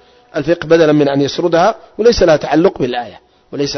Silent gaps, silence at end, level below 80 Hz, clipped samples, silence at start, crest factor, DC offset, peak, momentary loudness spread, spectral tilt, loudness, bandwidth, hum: none; 0 s; -36 dBFS; under 0.1%; 0.35 s; 14 dB; under 0.1%; 0 dBFS; 13 LU; -5.5 dB/octave; -13 LUFS; 6.4 kHz; none